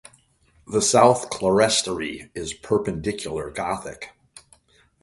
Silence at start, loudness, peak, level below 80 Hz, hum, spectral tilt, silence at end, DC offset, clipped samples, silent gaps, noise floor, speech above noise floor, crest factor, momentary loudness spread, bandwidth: 0.7 s; -22 LUFS; -2 dBFS; -52 dBFS; none; -3.5 dB/octave; 0.95 s; under 0.1%; under 0.1%; none; -60 dBFS; 38 dB; 22 dB; 16 LU; 11.5 kHz